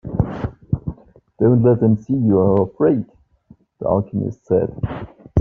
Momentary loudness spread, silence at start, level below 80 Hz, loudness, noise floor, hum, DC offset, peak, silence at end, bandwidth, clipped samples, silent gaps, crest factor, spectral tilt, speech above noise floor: 13 LU; 0.05 s; -40 dBFS; -19 LUFS; -51 dBFS; none; under 0.1%; -4 dBFS; 0 s; 3.6 kHz; under 0.1%; none; 16 dB; -11 dB/octave; 35 dB